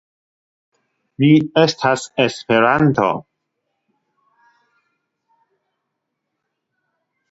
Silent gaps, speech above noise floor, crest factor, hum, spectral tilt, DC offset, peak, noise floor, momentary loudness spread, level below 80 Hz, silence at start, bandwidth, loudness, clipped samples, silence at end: none; 62 dB; 20 dB; none; -6 dB/octave; under 0.1%; 0 dBFS; -77 dBFS; 6 LU; -58 dBFS; 1.2 s; 8 kHz; -16 LUFS; under 0.1%; 4.1 s